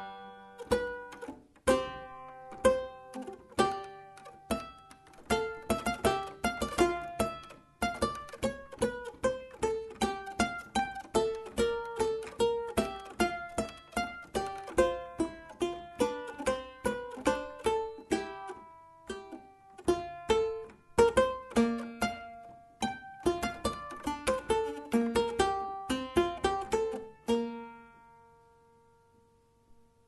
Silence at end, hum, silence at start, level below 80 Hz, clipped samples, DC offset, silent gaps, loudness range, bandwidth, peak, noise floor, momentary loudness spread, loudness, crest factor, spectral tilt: 0.35 s; none; 0 s; -52 dBFS; under 0.1%; under 0.1%; none; 4 LU; 12 kHz; -10 dBFS; -66 dBFS; 16 LU; -33 LUFS; 24 dB; -4.5 dB/octave